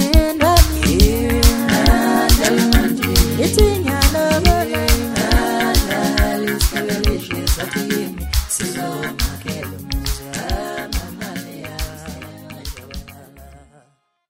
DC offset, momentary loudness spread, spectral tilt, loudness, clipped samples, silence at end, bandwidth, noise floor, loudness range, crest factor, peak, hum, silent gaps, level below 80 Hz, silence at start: under 0.1%; 15 LU; -4.5 dB/octave; -17 LUFS; under 0.1%; 0.7 s; 16.5 kHz; -59 dBFS; 13 LU; 16 dB; 0 dBFS; none; none; -20 dBFS; 0 s